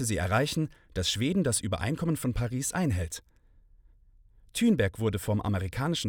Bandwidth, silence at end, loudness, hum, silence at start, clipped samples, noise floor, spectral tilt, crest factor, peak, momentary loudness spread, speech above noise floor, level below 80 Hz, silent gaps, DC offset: 18.5 kHz; 0 s; -29 LUFS; none; 0 s; under 0.1%; -59 dBFS; -5 dB/octave; 16 dB; -12 dBFS; 7 LU; 30 dB; -48 dBFS; none; under 0.1%